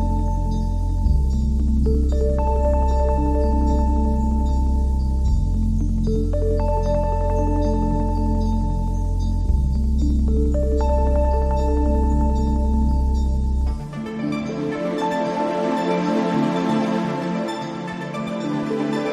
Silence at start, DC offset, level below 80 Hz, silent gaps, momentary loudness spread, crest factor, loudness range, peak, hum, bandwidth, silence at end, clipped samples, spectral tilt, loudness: 0 s; under 0.1%; -22 dBFS; none; 5 LU; 10 dB; 2 LU; -8 dBFS; none; 8.4 kHz; 0 s; under 0.1%; -8 dB/octave; -22 LUFS